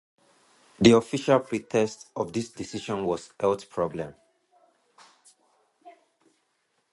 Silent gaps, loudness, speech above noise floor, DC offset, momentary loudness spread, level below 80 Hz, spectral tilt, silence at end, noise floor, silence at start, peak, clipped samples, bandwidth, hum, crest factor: none; -26 LUFS; 48 dB; under 0.1%; 15 LU; -60 dBFS; -5.5 dB/octave; 1 s; -73 dBFS; 0.8 s; -4 dBFS; under 0.1%; 11.5 kHz; none; 24 dB